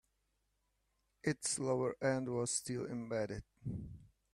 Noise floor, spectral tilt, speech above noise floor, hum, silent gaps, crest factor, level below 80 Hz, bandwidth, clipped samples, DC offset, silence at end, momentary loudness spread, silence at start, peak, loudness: -82 dBFS; -4.5 dB/octave; 43 dB; 50 Hz at -70 dBFS; none; 20 dB; -64 dBFS; 14.5 kHz; under 0.1%; under 0.1%; 0.3 s; 11 LU; 1.25 s; -22 dBFS; -39 LUFS